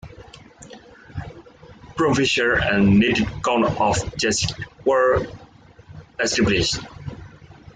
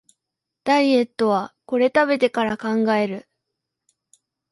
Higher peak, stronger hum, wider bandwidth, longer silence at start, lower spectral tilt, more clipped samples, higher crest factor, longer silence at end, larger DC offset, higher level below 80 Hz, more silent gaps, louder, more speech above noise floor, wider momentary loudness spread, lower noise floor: about the same, -6 dBFS vs -6 dBFS; neither; second, 9.6 kHz vs 11.5 kHz; second, 0.05 s vs 0.65 s; about the same, -4.5 dB/octave vs -5.5 dB/octave; neither; about the same, 16 dB vs 16 dB; second, 0.2 s vs 1.3 s; neither; first, -42 dBFS vs -64 dBFS; neither; about the same, -20 LUFS vs -20 LUFS; second, 27 dB vs 64 dB; first, 20 LU vs 9 LU; second, -46 dBFS vs -83 dBFS